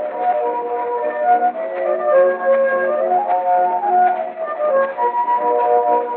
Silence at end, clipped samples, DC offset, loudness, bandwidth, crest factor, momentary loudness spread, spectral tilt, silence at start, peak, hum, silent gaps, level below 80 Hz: 0 s; under 0.1%; under 0.1%; -17 LUFS; 4.1 kHz; 12 dB; 6 LU; -2.5 dB/octave; 0 s; -4 dBFS; none; none; under -90 dBFS